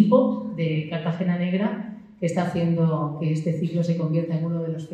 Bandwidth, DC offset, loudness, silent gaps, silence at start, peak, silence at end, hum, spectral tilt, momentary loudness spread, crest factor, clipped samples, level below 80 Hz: 9.2 kHz; under 0.1%; -24 LUFS; none; 0 s; -6 dBFS; 0 s; none; -8.5 dB/octave; 6 LU; 18 dB; under 0.1%; -64 dBFS